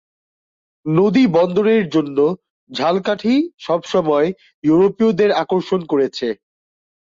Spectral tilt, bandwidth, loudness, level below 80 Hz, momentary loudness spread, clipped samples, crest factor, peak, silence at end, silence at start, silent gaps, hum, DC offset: -7 dB/octave; 7.6 kHz; -17 LUFS; -60 dBFS; 9 LU; under 0.1%; 14 dB; -4 dBFS; 0.85 s; 0.85 s; 2.50-2.67 s, 3.54-3.58 s, 4.54-4.62 s; none; under 0.1%